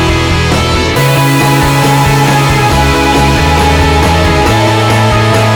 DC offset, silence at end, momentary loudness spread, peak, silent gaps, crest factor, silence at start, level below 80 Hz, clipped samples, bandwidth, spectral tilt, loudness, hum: under 0.1%; 0 s; 2 LU; 0 dBFS; none; 8 dB; 0 s; -20 dBFS; under 0.1%; over 20 kHz; -5 dB/octave; -8 LUFS; none